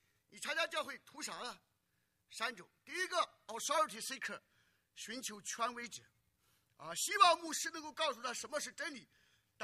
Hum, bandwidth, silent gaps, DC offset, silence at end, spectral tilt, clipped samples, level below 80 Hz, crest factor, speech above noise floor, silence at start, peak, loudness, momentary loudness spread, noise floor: none; 15 kHz; none; under 0.1%; 0 s; -0.5 dB/octave; under 0.1%; -88 dBFS; 28 dB; 42 dB; 0.3 s; -14 dBFS; -38 LUFS; 16 LU; -82 dBFS